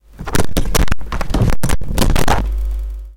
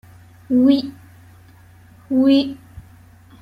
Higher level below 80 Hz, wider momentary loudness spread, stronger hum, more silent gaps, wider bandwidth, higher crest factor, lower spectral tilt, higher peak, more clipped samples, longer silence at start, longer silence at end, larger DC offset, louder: first, -18 dBFS vs -54 dBFS; second, 6 LU vs 17 LU; neither; neither; first, 17.5 kHz vs 5.4 kHz; second, 8 dB vs 16 dB; second, -5 dB/octave vs -7 dB/octave; about the same, -4 dBFS vs -4 dBFS; neither; second, 0.2 s vs 0.5 s; second, 0.05 s vs 0.6 s; neither; about the same, -19 LUFS vs -17 LUFS